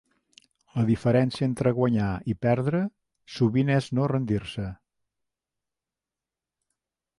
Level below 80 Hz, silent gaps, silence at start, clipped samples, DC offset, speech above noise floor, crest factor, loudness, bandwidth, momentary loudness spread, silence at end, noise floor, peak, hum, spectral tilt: -52 dBFS; none; 0.75 s; under 0.1%; under 0.1%; 65 dB; 16 dB; -26 LUFS; 11.5 kHz; 12 LU; 2.45 s; -89 dBFS; -10 dBFS; none; -8 dB/octave